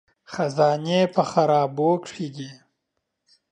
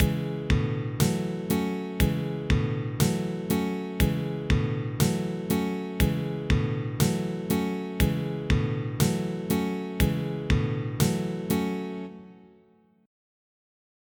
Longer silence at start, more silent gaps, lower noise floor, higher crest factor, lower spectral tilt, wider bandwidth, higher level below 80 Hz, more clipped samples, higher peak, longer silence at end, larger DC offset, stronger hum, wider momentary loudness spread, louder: first, 0.3 s vs 0 s; neither; first, -79 dBFS vs -61 dBFS; about the same, 18 dB vs 18 dB; about the same, -6 dB/octave vs -6 dB/octave; second, 10 kHz vs over 20 kHz; second, -70 dBFS vs -36 dBFS; neither; first, -6 dBFS vs -10 dBFS; second, 0.95 s vs 1.75 s; neither; neither; first, 15 LU vs 5 LU; first, -22 LUFS vs -28 LUFS